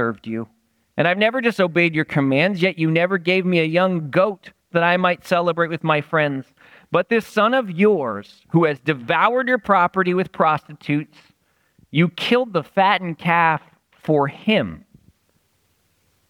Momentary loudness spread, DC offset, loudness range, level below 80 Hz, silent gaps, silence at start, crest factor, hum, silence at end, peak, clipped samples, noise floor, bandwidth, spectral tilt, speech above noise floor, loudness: 8 LU; under 0.1%; 2 LU; -62 dBFS; none; 0 s; 18 dB; none; 1.5 s; -2 dBFS; under 0.1%; -65 dBFS; 15.5 kHz; -7 dB/octave; 46 dB; -19 LUFS